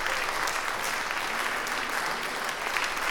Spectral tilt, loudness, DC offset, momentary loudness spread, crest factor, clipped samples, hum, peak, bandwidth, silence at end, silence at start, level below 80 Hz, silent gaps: -0.5 dB/octave; -29 LUFS; under 0.1%; 2 LU; 20 dB; under 0.1%; none; -10 dBFS; 19.5 kHz; 0 s; 0 s; -50 dBFS; none